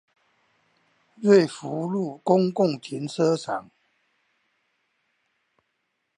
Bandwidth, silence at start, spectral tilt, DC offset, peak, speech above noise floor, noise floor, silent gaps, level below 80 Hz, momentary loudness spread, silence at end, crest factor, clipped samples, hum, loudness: 10.5 kHz; 1.2 s; -6.5 dB/octave; under 0.1%; -4 dBFS; 54 dB; -76 dBFS; none; -78 dBFS; 13 LU; 2.55 s; 22 dB; under 0.1%; none; -24 LUFS